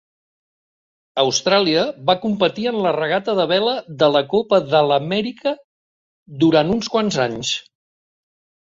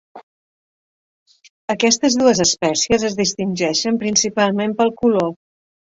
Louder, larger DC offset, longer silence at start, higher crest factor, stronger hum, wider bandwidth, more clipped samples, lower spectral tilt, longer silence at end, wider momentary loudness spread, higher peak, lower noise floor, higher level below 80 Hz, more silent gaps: about the same, -18 LUFS vs -17 LUFS; neither; first, 1.15 s vs 0.15 s; about the same, 18 dB vs 18 dB; neither; about the same, 7.8 kHz vs 7.8 kHz; neither; first, -4.5 dB/octave vs -3 dB/octave; first, 1.05 s vs 0.65 s; about the same, 8 LU vs 6 LU; about the same, -2 dBFS vs -2 dBFS; about the same, under -90 dBFS vs under -90 dBFS; second, -58 dBFS vs -52 dBFS; second, 5.64-6.26 s vs 0.23-1.26 s, 1.50-1.68 s